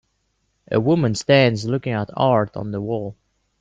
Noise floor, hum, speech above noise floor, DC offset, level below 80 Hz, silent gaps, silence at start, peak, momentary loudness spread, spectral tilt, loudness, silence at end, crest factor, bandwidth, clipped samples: -69 dBFS; none; 50 dB; under 0.1%; -56 dBFS; none; 0.7 s; -2 dBFS; 11 LU; -6 dB/octave; -20 LUFS; 0.45 s; 18 dB; 9.4 kHz; under 0.1%